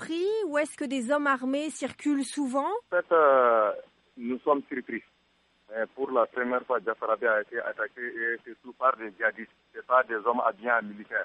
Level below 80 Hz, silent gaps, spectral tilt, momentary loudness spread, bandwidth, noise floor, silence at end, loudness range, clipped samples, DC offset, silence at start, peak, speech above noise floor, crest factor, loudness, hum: -78 dBFS; none; -3.5 dB/octave; 12 LU; 11.5 kHz; -68 dBFS; 0 s; 4 LU; under 0.1%; under 0.1%; 0 s; -10 dBFS; 40 dB; 18 dB; -28 LUFS; none